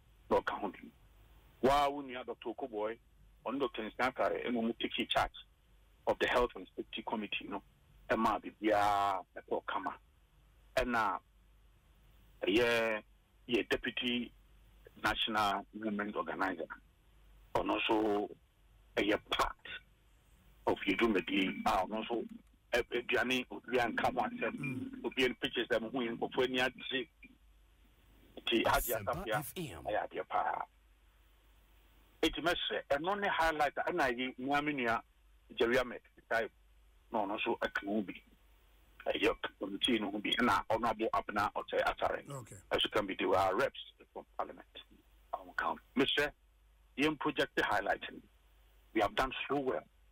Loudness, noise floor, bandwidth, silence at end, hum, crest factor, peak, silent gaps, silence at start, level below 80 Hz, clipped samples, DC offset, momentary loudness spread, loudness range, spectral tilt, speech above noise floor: -35 LUFS; -66 dBFS; 16 kHz; 0.3 s; none; 16 dB; -20 dBFS; none; 0.3 s; -58 dBFS; under 0.1%; under 0.1%; 12 LU; 3 LU; -4 dB/octave; 31 dB